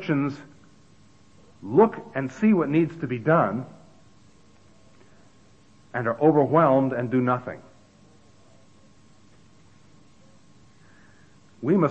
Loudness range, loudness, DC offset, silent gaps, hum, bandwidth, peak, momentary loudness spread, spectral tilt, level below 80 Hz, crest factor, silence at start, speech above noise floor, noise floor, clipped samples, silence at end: 7 LU; -23 LUFS; 0.2%; none; none; 8.4 kHz; -6 dBFS; 15 LU; -9 dB/octave; -66 dBFS; 20 dB; 0 s; 35 dB; -56 dBFS; under 0.1%; 0 s